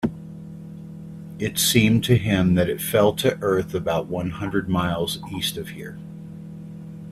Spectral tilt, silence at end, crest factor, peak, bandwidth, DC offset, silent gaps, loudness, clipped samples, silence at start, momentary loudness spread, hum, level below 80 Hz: -5 dB/octave; 0 s; 20 dB; -2 dBFS; 16 kHz; under 0.1%; none; -22 LUFS; under 0.1%; 0 s; 20 LU; none; -48 dBFS